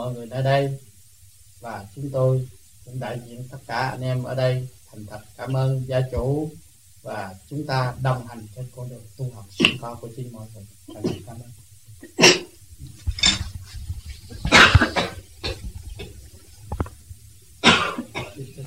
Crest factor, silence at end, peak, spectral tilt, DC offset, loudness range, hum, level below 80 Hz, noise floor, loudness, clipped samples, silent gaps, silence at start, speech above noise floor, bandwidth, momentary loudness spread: 24 dB; 0 s; 0 dBFS; -4 dB/octave; 0.3%; 9 LU; none; -38 dBFS; -52 dBFS; -21 LUFS; under 0.1%; none; 0 s; 27 dB; 16 kHz; 23 LU